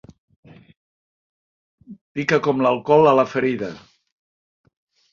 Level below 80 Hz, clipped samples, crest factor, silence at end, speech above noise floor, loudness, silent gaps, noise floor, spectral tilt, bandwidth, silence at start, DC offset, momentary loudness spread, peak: -62 dBFS; under 0.1%; 20 dB; 1.35 s; over 72 dB; -18 LUFS; 2.01-2.15 s; under -90 dBFS; -6.5 dB/octave; 7.4 kHz; 1.9 s; under 0.1%; 15 LU; -2 dBFS